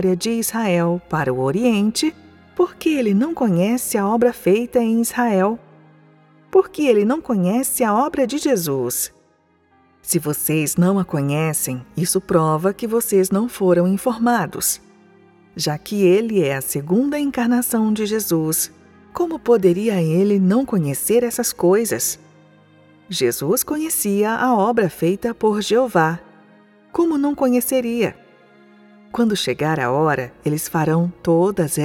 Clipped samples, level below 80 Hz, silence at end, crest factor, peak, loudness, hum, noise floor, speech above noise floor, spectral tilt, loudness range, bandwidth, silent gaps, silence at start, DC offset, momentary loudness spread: under 0.1%; -54 dBFS; 0 s; 16 dB; -2 dBFS; -19 LUFS; none; -59 dBFS; 41 dB; -5 dB/octave; 2 LU; 18 kHz; none; 0 s; under 0.1%; 6 LU